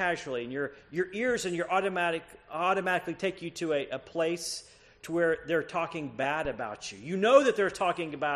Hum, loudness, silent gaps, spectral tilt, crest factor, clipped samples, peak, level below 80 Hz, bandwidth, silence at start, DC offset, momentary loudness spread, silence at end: none; -30 LUFS; none; -4 dB/octave; 22 dB; under 0.1%; -8 dBFS; -62 dBFS; 13 kHz; 0 s; under 0.1%; 9 LU; 0 s